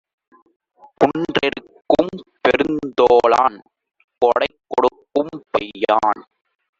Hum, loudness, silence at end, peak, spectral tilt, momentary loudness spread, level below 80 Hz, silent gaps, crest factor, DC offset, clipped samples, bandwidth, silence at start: none; -18 LUFS; 0.6 s; 0 dBFS; -5.5 dB/octave; 9 LU; -54 dBFS; 4.04-4.08 s; 18 dB; under 0.1%; under 0.1%; 7.6 kHz; 1 s